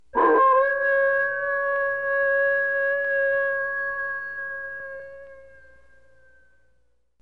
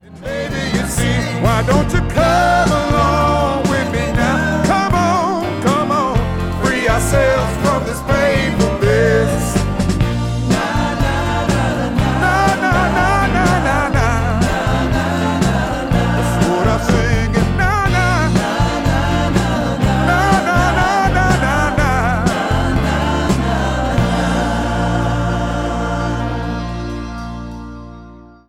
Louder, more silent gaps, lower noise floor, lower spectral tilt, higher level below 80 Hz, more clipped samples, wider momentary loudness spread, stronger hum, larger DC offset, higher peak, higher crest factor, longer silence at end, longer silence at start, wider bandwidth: second, -22 LUFS vs -16 LUFS; neither; first, -68 dBFS vs -38 dBFS; about the same, -6 dB/octave vs -5.5 dB/octave; second, -62 dBFS vs -24 dBFS; neither; first, 14 LU vs 6 LU; neither; first, 0.3% vs under 0.1%; second, -10 dBFS vs -2 dBFS; about the same, 16 dB vs 14 dB; first, 1.8 s vs 0.25 s; about the same, 0.15 s vs 0.1 s; second, 4.5 kHz vs 16.5 kHz